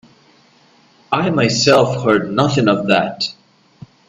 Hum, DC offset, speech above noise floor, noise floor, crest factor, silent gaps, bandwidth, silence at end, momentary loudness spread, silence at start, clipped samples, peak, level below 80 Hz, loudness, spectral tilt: none; under 0.1%; 37 dB; -51 dBFS; 18 dB; none; 12 kHz; 0.75 s; 9 LU; 1.1 s; under 0.1%; 0 dBFS; -54 dBFS; -15 LUFS; -5 dB/octave